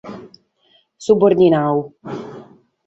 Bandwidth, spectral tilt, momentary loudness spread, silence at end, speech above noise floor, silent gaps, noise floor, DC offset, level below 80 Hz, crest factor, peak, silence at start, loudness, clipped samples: 8 kHz; -7.5 dB/octave; 23 LU; 0.45 s; 44 dB; none; -58 dBFS; under 0.1%; -58 dBFS; 16 dB; -2 dBFS; 0.05 s; -15 LUFS; under 0.1%